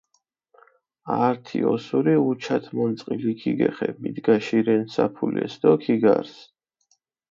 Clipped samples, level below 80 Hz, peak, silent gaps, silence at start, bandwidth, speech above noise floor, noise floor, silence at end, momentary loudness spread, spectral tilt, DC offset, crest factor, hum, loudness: under 0.1%; -68 dBFS; -4 dBFS; none; 1.05 s; 7.4 kHz; 49 dB; -71 dBFS; 0.85 s; 7 LU; -7.5 dB/octave; under 0.1%; 20 dB; none; -23 LUFS